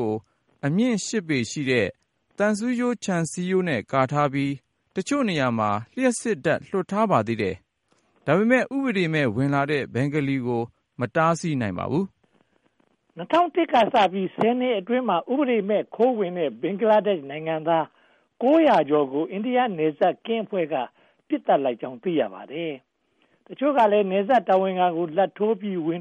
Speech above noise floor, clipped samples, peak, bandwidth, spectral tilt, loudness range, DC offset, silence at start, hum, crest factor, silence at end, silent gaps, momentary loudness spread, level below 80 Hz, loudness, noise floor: 45 dB; under 0.1%; -6 dBFS; 11.5 kHz; -6 dB/octave; 3 LU; under 0.1%; 0 s; none; 18 dB; 0 s; none; 10 LU; -66 dBFS; -23 LUFS; -67 dBFS